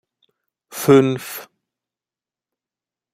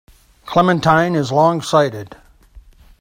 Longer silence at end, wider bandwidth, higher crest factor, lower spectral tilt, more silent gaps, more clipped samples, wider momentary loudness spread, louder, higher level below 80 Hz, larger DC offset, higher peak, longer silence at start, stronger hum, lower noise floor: first, 1.7 s vs 0.4 s; about the same, 16 kHz vs 16.5 kHz; about the same, 20 dB vs 18 dB; about the same, -6 dB/octave vs -6 dB/octave; neither; neither; first, 20 LU vs 6 LU; about the same, -16 LUFS vs -15 LUFS; second, -62 dBFS vs -48 dBFS; neither; about the same, -2 dBFS vs 0 dBFS; first, 0.75 s vs 0.45 s; neither; first, under -90 dBFS vs -44 dBFS